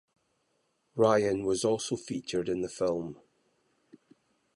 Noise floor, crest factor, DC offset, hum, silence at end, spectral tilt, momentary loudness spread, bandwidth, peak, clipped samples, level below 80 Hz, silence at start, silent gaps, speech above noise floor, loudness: -75 dBFS; 20 dB; under 0.1%; none; 1.4 s; -5 dB/octave; 11 LU; 11.5 kHz; -12 dBFS; under 0.1%; -64 dBFS; 0.95 s; none; 46 dB; -30 LUFS